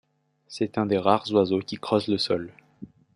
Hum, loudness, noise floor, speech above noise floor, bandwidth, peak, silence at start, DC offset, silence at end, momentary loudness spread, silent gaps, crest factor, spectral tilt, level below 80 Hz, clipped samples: none; -25 LUFS; -47 dBFS; 23 dB; 11.5 kHz; -4 dBFS; 0.5 s; under 0.1%; 0.3 s; 9 LU; none; 22 dB; -6 dB/octave; -68 dBFS; under 0.1%